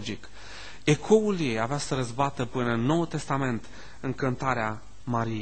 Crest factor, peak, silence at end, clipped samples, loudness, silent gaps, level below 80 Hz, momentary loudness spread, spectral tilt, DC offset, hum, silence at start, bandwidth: 20 dB; -8 dBFS; 0 s; under 0.1%; -28 LUFS; none; -52 dBFS; 17 LU; -6 dB/octave; 1%; none; 0 s; 9 kHz